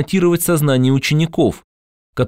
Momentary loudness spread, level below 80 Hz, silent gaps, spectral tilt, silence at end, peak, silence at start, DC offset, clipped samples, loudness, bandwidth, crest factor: 9 LU; -46 dBFS; 1.64-2.13 s; -5.5 dB/octave; 0 s; -4 dBFS; 0 s; under 0.1%; under 0.1%; -15 LUFS; 16 kHz; 12 dB